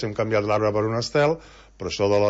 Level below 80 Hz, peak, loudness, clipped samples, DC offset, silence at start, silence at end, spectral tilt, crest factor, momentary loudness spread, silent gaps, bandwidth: -50 dBFS; -8 dBFS; -23 LUFS; under 0.1%; under 0.1%; 0 s; 0 s; -5.5 dB/octave; 14 dB; 10 LU; none; 8 kHz